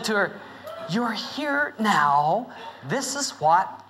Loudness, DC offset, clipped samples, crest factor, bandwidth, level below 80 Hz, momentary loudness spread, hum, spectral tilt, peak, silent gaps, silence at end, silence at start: -24 LUFS; under 0.1%; under 0.1%; 16 dB; 16 kHz; -74 dBFS; 18 LU; none; -3.5 dB/octave; -8 dBFS; none; 0.05 s; 0 s